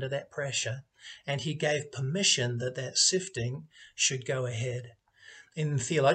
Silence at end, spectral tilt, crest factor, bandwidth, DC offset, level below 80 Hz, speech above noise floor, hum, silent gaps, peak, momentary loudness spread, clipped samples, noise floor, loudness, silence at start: 0 s; -3 dB/octave; 20 dB; 9.4 kHz; under 0.1%; -68 dBFS; 24 dB; none; none; -10 dBFS; 17 LU; under 0.1%; -55 dBFS; -29 LUFS; 0 s